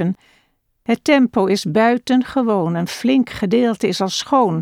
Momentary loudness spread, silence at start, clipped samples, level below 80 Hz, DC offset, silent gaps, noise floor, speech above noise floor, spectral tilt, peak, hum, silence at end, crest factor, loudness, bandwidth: 7 LU; 0 s; under 0.1%; -54 dBFS; under 0.1%; none; -62 dBFS; 45 dB; -5.5 dB/octave; -2 dBFS; none; 0 s; 14 dB; -17 LUFS; 15 kHz